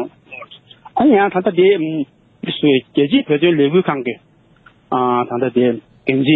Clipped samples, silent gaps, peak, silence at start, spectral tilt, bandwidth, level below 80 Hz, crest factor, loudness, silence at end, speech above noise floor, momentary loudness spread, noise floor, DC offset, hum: under 0.1%; none; -2 dBFS; 0 s; -10 dB/octave; 4.1 kHz; -60 dBFS; 14 dB; -16 LUFS; 0 s; 35 dB; 16 LU; -49 dBFS; under 0.1%; none